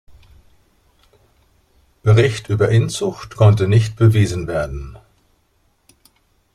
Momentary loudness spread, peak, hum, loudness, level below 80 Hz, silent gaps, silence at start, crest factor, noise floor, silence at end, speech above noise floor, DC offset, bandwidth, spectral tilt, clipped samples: 11 LU; -2 dBFS; none; -16 LUFS; -42 dBFS; none; 2.05 s; 16 dB; -61 dBFS; 1.55 s; 46 dB; under 0.1%; 11.5 kHz; -7 dB/octave; under 0.1%